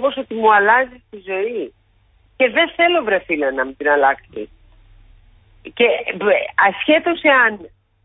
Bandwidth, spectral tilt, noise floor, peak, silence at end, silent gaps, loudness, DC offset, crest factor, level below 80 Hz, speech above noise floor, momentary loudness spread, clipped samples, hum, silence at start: 4 kHz; -8.5 dB/octave; -56 dBFS; -2 dBFS; 0.4 s; none; -16 LUFS; under 0.1%; 16 dB; -54 dBFS; 39 dB; 19 LU; under 0.1%; none; 0 s